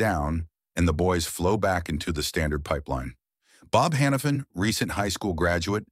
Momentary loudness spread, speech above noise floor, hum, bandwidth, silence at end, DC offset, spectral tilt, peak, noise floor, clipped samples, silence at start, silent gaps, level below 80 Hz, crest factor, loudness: 7 LU; 34 dB; none; 16 kHz; 0.05 s; under 0.1%; -5 dB/octave; -8 dBFS; -59 dBFS; under 0.1%; 0 s; none; -40 dBFS; 18 dB; -26 LUFS